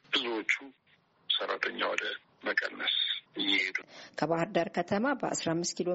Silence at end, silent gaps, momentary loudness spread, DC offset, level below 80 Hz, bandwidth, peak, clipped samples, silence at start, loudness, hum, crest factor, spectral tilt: 0 s; none; 6 LU; under 0.1%; -74 dBFS; 8 kHz; -12 dBFS; under 0.1%; 0.1 s; -31 LUFS; none; 20 dB; -1.5 dB/octave